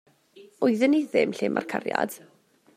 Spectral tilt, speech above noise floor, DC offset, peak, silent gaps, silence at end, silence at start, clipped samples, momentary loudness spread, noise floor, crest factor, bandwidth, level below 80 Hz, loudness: -5.5 dB/octave; 29 dB; under 0.1%; -6 dBFS; none; 0.6 s; 0.35 s; under 0.1%; 8 LU; -53 dBFS; 20 dB; 16 kHz; -76 dBFS; -25 LUFS